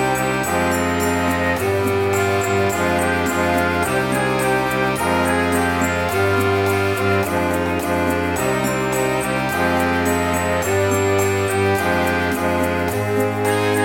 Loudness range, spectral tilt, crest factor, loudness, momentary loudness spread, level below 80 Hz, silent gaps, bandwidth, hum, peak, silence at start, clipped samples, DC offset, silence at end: 1 LU; -5 dB/octave; 12 dB; -19 LUFS; 2 LU; -46 dBFS; none; 17 kHz; none; -6 dBFS; 0 s; under 0.1%; 0.1%; 0 s